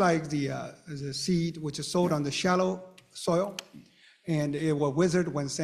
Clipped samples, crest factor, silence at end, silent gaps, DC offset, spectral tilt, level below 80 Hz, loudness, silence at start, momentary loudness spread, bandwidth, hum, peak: under 0.1%; 18 dB; 0 s; none; under 0.1%; -5.5 dB/octave; -62 dBFS; -29 LUFS; 0 s; 13 LU; 14 kHz; none; -10 dBFS